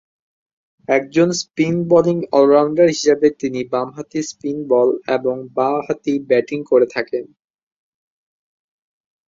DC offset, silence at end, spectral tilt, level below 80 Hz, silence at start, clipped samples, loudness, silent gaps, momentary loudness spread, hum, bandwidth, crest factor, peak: under 0.1%; 2 s; -5.5 dB/octave; -62 dBFS; 0.9 s; under 0.1%; -17 LUFS; none; 11 LU; none; 7.8 kHz; 16 dB; -2 dBFS